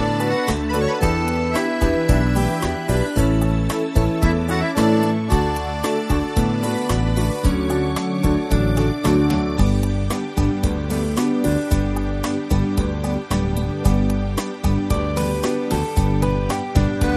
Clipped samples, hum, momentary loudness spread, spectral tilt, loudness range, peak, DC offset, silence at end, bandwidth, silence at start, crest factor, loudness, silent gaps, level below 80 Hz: under 0.1%; none; 5 LU; -6.5 dB/octave; 2 LU; -2 dBFS; under 0.1%; 0 s; 13.5 kHz; 0 s; 16 dB; -20 LUFS; none; -26 dBFS